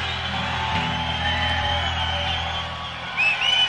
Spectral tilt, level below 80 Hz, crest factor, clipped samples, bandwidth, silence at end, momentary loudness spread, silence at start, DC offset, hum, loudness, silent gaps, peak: -3.5 dB/octave; -38 dBFS; 14 dB; under 0.1%; 11.5 kHz; 0 s; 8 LU; 0 s; under 0.1%; none; -23 LUFS; none; -10 dBFS